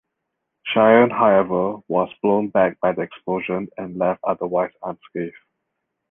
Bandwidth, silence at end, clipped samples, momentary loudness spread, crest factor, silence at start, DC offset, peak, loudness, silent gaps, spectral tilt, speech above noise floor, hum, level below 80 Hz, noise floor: 3.8 kHz; 0.8 s; under 0.1%; 16 LU; 20 dB; 0.65 s; under 0.1%; -2 dBFS; -20 LUFS; none; -9.5 dB/octave; 59 dB; none; -60 dBFS; -78 dBFS